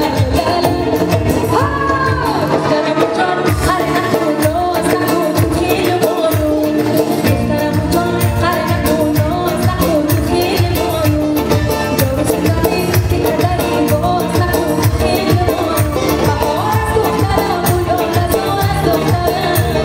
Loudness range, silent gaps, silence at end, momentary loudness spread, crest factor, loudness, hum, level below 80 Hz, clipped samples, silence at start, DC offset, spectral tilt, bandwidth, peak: 0 LU; none; 0 s; 1 LU; 14 dB; -14 LUFS; none; -28 dBFS; under 0.1%; 0 s; under 0.1%; -6 dB/octave; 16.5 kHz; 0 dBFS